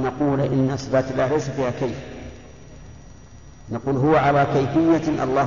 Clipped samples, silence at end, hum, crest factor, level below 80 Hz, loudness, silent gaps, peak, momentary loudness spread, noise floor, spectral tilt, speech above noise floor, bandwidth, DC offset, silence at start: under 0.1%; 0 s; none; 14 dB; -44 dBFS; -21 LUFS; none; -6 dBFS; 15 LU; -44 dBFS; -7.5 dB/octave; 24 dB; 7.4 kHz; 0.4%; 0 s